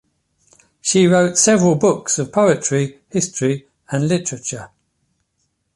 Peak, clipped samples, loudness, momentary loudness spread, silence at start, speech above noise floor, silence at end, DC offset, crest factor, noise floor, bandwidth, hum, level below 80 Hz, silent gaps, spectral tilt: -2 dBFS; under 0.1%; -17 LUFS; 13 LU; 0.85 s; 53 dB; 1.1 s; under 0.1%; 16 dB; -69 dBFS; 11.5 kHz; none; -56 dBFS; none; -4.5 dB/octave